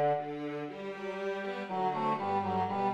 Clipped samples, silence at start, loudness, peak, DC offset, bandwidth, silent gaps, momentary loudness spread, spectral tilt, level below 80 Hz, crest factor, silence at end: under 0.1%; 0 s; -34 LUFS; -20 dBFS; under 0.1%; 9 kHz; none; 8 LU; -7 dB/octave; -74 dBFS; 14 dB; 0 s